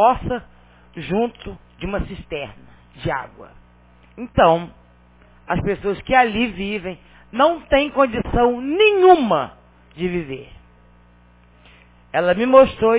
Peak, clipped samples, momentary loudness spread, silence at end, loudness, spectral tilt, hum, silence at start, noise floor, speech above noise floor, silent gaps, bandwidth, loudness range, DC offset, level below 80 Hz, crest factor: 0 dBFS; under 0.1%; 21 LU; 0 s; -18 LUFS; -9.5 dB/octave; 60 Hz at -50 dBFS; 0 s; -51 dBFS; 33 dB; none; 4 kHz; 11 LU; under 0.1%; -40 dBFS; 20 dB